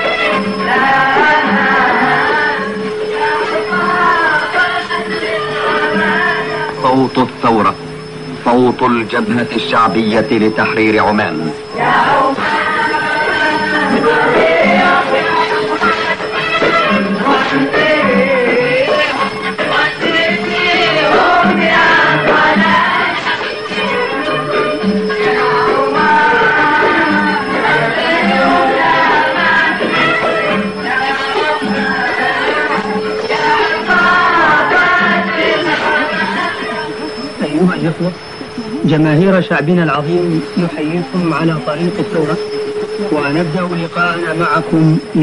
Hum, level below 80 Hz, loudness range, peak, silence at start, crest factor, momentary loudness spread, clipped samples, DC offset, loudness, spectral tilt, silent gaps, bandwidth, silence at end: none; -46 dBFS; 4 LU; -2 dBFS; 0 s; 12 dB; 7 LU; under 0.1%; 0.6%; -12 LUFS; -5.5 dB/octave; none; 11 kHz; 0 s